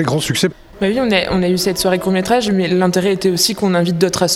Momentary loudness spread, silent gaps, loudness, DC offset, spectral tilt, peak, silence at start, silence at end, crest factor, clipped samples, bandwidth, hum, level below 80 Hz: 3 LU; none; -15 LUFS; under 0.1%; -4.5 dB/octave; 0 dBFS; 0 s; 0 s; 16 dB; under 0.1%; 16.5 kHz; none; -42 dBFS